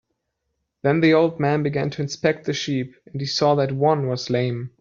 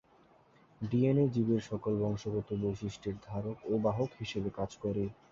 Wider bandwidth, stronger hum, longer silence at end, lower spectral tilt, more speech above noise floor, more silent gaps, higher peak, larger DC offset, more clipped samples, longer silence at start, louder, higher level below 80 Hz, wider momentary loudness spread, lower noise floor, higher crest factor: about the same, 7.4 kHz vs 7.6 kHz; neither; about the same, 0.1 s vs 0.2 s; second, -6 dB/octave vs -8 dB/octave; first, 55 dB vs 31 dB; neither; first, -4 dBFS vs -18 dBFS; neither; neither; about the same, 0.85 s vs 0.8 s; first, -21 LUFS vs -34 LUFS; about the same, -60 dBFS vs -58 dBFS; about the same, 9 LU vs 10 LU; first, -76 dBFS vs -64 dBFS; about the same, 18 dB vs 16 dB